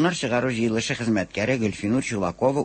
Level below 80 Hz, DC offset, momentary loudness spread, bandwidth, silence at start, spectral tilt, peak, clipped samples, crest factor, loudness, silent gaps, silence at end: -52 dBFS; under 0.1%; 2 LU; 8.8 kHz; 0 s; -5 dB/octave; -8 dBFS; under 0.1%; 16 dB; -24 LUFS; none; 0 s